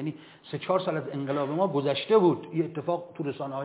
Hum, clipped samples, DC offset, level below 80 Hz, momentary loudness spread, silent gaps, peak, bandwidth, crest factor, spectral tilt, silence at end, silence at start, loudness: none; under 0.1%; under 0.1%; -76 dBFS; 14 LU; none; -10 dBFS; 4 kHz; 18 dB; -11 dB/octave; 0 s; 0 s; -28 LUFS